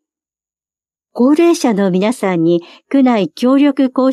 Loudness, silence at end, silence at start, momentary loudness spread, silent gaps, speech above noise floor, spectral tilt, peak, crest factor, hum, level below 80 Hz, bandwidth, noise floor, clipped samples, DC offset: -13 LUFS; 0 s; 1.15 s; 5 LU; none; over 78 dB; -6 dB/octave; -2 dBFS; 12 dB; none; -70 dBFS; 13 kHz; under -90 dBFS; under 0.1%; under 0.1%